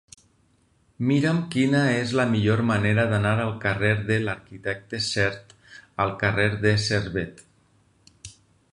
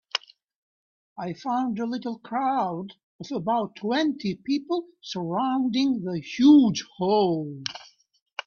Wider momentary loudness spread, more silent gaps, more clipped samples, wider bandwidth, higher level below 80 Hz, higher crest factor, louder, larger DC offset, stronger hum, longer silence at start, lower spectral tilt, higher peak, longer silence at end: second, 12 LU vs 16 LU; second, none vs 0.56-1.16 s, 3.03-3.19 s, 8.22-8.26 s; neither; first, 11 kHz vs 7 kHz; first, -50 dBFS vs -68 dBFS; about the same, 18 dB vs 18 dB; about the same, -23 LUFS vs -25 LUFS; neither; neither; first, 1 s vs 0.15 s; about the same, -6 dB/octave vs -6 dB/octave; about the same, -6 dBFS vs -8 dBFS; first, 0.45 s vs 0.05 s